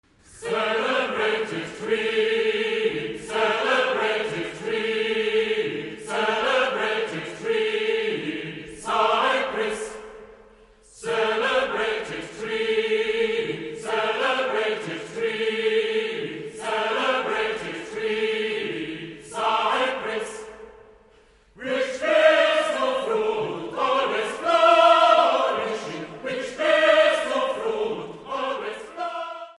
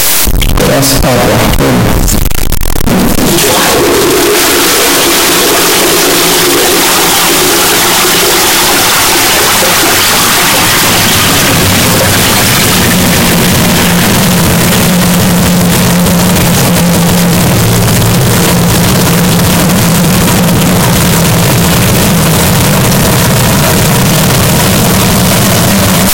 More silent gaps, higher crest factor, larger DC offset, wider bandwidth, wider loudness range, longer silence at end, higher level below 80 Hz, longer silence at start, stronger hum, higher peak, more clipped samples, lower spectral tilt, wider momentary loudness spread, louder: neither; first, 20 dB vs 6 dB; second, under 0.1% vs 3%; second, 11.5 kHz vs 17.5 kHz; first, 7 LU vs 2 LU; about the same, 0.05 s vs 0 s; second, -62 dBFS vs -20 dBFS; first, 0.3 s vs 0 s; neither; second, -4 dBFS vs 0 dBFS; second, under 0.1% vs 0.1%; about the same, -3.5 dB/octave vs -3.5 dB/octave; first, 14 LU vs 2 LU; second, -23 LUFS vs -6 LUFS